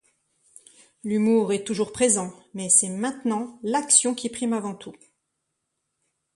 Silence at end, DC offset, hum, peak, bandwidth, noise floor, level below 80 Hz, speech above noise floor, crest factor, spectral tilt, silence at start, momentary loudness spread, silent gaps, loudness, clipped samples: 1.45 s; under 0.1%; none; -4 dBFS; 11.5 kHz; -79 dBFS; -66 dBFS; 55 dB; 22 dB; -3 dB/octave; 1.05 s; 16 LU; none; -22 LUFS; under 0.1%